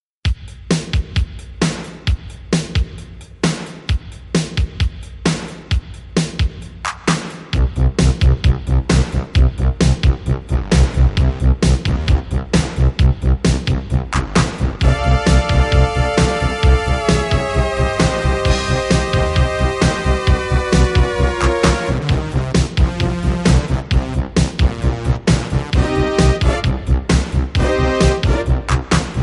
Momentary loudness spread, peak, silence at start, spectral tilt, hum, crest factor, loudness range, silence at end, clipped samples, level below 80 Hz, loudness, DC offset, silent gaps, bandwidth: 8 LU; -2 dBFS; 0.25 s; -5.5 dB/octave; none; 14 dB; 6 LU; 0 s; under 0.1%; -18 dBFS; -17 LUFS; under 0.1%; none; 11.5 kHz